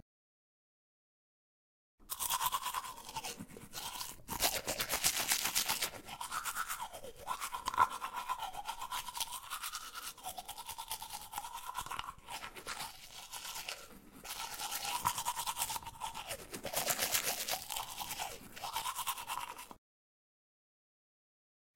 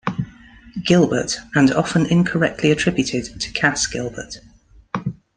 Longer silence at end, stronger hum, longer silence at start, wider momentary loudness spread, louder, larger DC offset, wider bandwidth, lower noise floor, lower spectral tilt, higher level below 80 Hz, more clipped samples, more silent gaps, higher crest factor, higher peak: first, 2 s vs 0.25 s; neither; first, 2 s vs 0.05 s; about the same, 13 LU vs 15 LU; second, -38 LUFS vs -19 LUFS; neither; first, 17 kHz vs 10 kHz; first, under -90 dBFS vs -40 dBFS; second, 0 dB/octave vs -5 dB/octave; second, -64 dBFS vs -46 dBFS; neither; neither; first, 32 dB vs 18 dB; second, -8 dBFS vs -2 dBFS